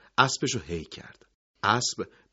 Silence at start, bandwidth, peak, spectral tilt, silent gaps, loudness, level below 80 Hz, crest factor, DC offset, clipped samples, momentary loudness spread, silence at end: 0.2 s; 8 kHz; -2 dBFS; -2.5 dB/octave; 1.34-1.54 s; -27 LUFS; -60 dBFS; 26 dB; under 0.1%; under 0.1%; 16 LU; 0.25 s